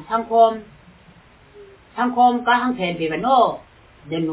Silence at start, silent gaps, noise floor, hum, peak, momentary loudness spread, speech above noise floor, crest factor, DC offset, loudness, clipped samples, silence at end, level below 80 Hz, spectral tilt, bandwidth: 0 s; none; -49 dBFS; none; -4 dBFS; 15 LU; 31 dB; 16 dB; under 0.1%; -19 LUFS; under 0.1%; 0 s; -56 dBFS; -9 dB/octave; 4 kHz